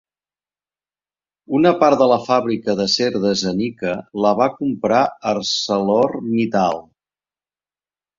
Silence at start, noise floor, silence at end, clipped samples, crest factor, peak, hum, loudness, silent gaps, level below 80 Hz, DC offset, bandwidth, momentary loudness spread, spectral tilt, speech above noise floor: 1.5 s; under -90 dBFS; 1.35 s; under 0.1%; 18 dB; -2 dBFS; none; -18 LUFS; none; -58 dBFS; under 0.1%; 7.6 kHz; 8 LU; -5 dB/octave; over 73 dB